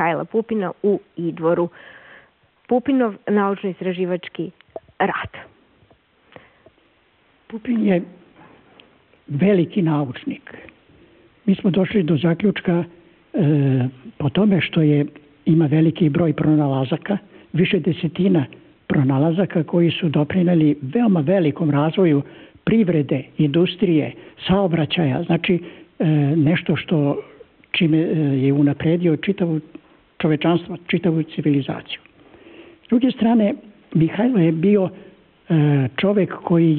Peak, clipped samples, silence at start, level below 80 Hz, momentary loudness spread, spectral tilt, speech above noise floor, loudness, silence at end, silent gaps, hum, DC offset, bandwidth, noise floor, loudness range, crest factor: -8 dBFS; under 0.1%; 0 s; -54 dBFS; 11 LU; -6.5 dB/octave; 40 dB; -19 LUFS; 0 s; none; none; under 0.1%; 4.3 kHz; -59 dBFS; 6 LU; 12 dB